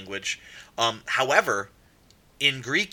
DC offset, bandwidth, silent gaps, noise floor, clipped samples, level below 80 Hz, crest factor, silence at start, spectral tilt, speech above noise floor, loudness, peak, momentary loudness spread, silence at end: under 0.1%; 19 kHz; none; -58 dBFS; under 0.1%; -64 dBFS; 24 dB; 0 s; -2 dB/octave; 32 dB; -24 LUFS; -4 dBFS; 14 LU; 0.05 s